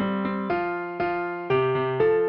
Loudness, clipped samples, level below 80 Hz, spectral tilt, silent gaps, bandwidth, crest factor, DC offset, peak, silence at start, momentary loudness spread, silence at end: -25 LUFS; under 0.1%; -58 dBFS; -9.5 dB/octave; none; 5.4 kHz; 14 dB; under 0.1%; -12 dBFS; 0 s; 6 LU; 0 s